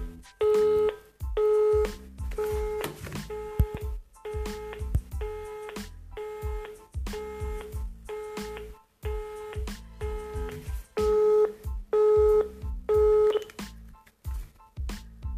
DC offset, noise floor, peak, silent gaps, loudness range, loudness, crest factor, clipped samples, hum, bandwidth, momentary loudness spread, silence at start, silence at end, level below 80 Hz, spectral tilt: under 0.1%; -50 dBFS; -10 dBFS; none; 13 LU; -29 LUFS; 18 dB; under 0.1%; none; 15.5 kHz; 18 LU; 0 s; 0 s; -38 dBFS; -6.5 dB/octave